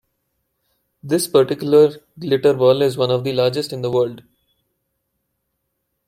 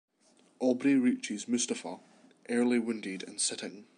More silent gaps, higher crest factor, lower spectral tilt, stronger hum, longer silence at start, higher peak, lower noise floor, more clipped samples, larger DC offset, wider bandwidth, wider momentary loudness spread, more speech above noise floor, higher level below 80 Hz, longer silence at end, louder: neither; about the same, 18 dB vs 16 dB; first, -5.5 dB/octave vs -3 dB/octave; neither; first, 1.05 s vs 0.6 s; first, -2 dBFS vs -16 dBFS; first, -74 dBFS vs -66 dBFS; neither; neither; first, 16 kHz vs 11 kHz; second, 8 LU vs 12 LU; first, 57 dB vs 35 dB; first, -62 dBFS vs -88 dBFS; first, 1.9 s vs 0.15 s; first, -17 LUFS vs -31 LUFS